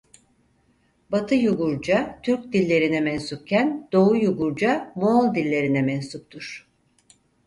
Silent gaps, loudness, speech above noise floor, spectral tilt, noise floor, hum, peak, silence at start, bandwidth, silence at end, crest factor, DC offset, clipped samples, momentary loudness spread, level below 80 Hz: none; -22 LUFS; 42 dB; -7 dB/octave; -64 dBFS; none; -6 dBFS; 1.1 s; 11.5 kHz; 0.9 s; 16 dB; under 0.1%; under 0.1%; 13 LU; -58 dBFS